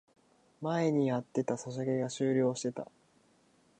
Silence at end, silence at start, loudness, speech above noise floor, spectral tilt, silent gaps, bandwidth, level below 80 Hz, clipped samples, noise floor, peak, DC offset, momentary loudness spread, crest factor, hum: 0.95 s; 0.6 s; -33 LUFS; 36 dB; -6.5 dB/octave; none; 9.4 kHz; -78 dBFS; under 0.1%; -67 dBFS; -18 dBFS; under 0.1%; 10 LU; 16 dB; none